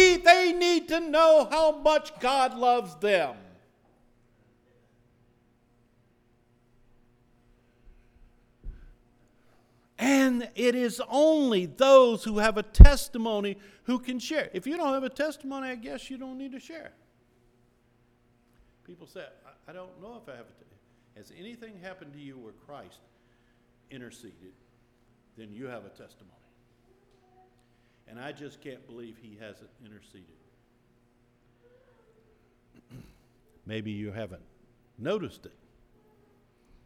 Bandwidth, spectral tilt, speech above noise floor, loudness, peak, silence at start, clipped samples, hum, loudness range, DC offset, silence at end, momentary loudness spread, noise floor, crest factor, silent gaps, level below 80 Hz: 15 kHz; -5.5 dB/octave; 40 dB; -24 LUFS; 0 dBFS; 0 s; under 0.1%; none; 27 LU; under 0.1%; 1.55 s; 29 LU; -66 dBFS; 28 dB; none; -32 dBFS